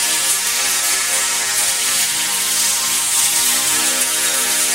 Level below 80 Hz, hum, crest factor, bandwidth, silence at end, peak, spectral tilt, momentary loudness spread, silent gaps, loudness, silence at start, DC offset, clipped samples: -56 dBFS; none; 14 dB; 16 kHz; 0 s; -2 dBFS; 2 dB/octave; 2 LU; none; -14 LUFS; 0 s; 0.1%; under 0.1%